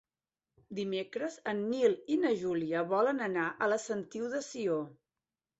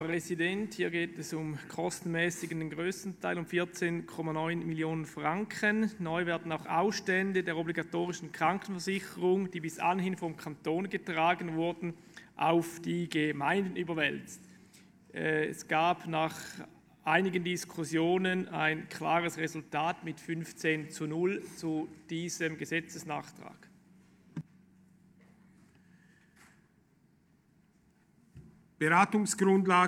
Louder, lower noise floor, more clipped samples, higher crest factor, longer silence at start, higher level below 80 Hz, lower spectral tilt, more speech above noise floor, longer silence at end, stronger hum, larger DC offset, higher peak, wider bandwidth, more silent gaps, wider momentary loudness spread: about the same, -33 LUFS vs -32 LUFS; first, under -90 dBFS vs -67 dBFS; neither; about the same, 18 dB vs 22 dB; first, 0.7 s vs 0 s; about the same, -76 dBFS vs -74 dBFS; about the same, -5 dB/octave vs -5 dB/octave; first, over 57 dB vs 35 dB; first, 0.65 s vs 0 s; neither; neither; second, -16 dBFS vs -10 dBFS; second, 8.2 kHz vs 16 kHz; neither; second, 8 LU vs 11 LU